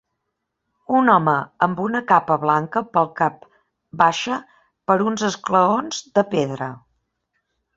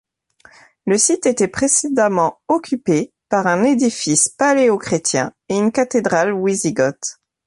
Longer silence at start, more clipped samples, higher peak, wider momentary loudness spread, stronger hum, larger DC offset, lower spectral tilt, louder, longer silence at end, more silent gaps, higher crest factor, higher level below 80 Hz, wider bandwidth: about the same, 0.9 s vs 0.85 s; neither; about the same, -2 dBFS vs -2 dBFS; first, 9 LU vs 6 LU; neither; neither; first, -5 dB/octave vs -3.5 dB/octave; second, -20 LUFS vs -17 LUFS; first, 1 s vs 0.35 s; neither; about the same, 20 dB vs 16 dB; second, -62 dBFS vs -56 dBFS; second, 8 kHz vs 11.5 kHz